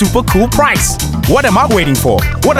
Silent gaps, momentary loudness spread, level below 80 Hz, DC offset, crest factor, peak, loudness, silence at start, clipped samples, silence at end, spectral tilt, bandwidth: none; 3 LU; -22 dBFS; under 0.1%; 10 dB; 0 dBFS; -11 LUFS; 0 s; under 0.1%; 0 s; -4.5 dB/octave; 17.5 kHz